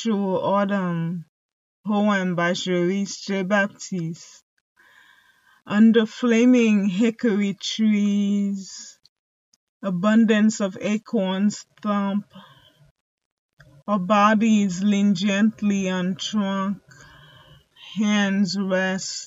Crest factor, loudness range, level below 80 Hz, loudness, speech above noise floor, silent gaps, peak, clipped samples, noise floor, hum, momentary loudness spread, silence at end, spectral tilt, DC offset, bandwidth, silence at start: 18 dB; 5 LU; -70 dBFS; -21 LUFS; 37 dB; 1.29-1.84 s, 4.43-4.76 s, 9.09-9.80 s, 12.91-13.18 s, 13.25-13.57 s; -4 dBFS; under 0.1%; -58 dBFS; none; 13 LU; 0 s; -5.5 dB/octave; under 0.1%; 8 kHz; 0 s